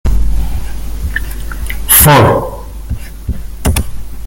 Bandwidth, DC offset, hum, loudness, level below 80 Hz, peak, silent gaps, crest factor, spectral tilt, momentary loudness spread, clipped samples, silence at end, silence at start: over 20 kHz; under 0.1%; none; -11 LUFS; -18 dBFS; 0 dBFS; none; 12 dB; -4 dB/octave; 19 LU; 0.4%; 0 s; 0.05 s